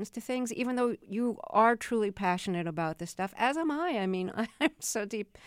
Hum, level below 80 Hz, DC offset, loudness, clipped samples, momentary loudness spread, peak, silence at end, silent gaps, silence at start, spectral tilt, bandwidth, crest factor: none; -66 dBFS; under 0.1%; -31 LUFS; under 0.1%; 9 LU; -12 dBFS; 0 s; none; 0 s; -4.5 dB/octave; 16.5 kHz; 18 dB